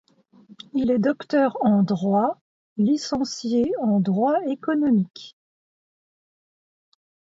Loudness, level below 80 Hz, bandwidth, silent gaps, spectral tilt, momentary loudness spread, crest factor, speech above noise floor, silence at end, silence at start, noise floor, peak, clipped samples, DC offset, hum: -22 LUFS; -62 dBFS; 7.8 kHz; 2.41-2.76 s; -7 dB/octave; 7 LU; 16 dB; 31 dB; 2.1 s; 0.75 s; -52 dBFS; -8 dBFS; under 0.1%; under 0.1%; none